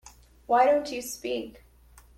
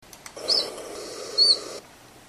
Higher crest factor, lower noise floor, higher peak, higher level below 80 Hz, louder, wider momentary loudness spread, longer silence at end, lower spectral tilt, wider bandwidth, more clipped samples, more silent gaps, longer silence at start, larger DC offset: about the same, 18 dB vs 18 dB; first, -55 dBFS vs -48 dBFS; about the same, -10 dBFS vs -8 dBFS; first, -58 dBFS vs -64 dBFS; second, -26 LUFS vs -21 LUFS; second, 13 LU vs 21 LU; first, 0.65 s vs 0.1 s; first, -3 dB/octave vs 0 dB/octave; about the same, 16 kHz vs 15.5 kHz; neither; neither; about the same, 0.05 s vs 0.05 s; neither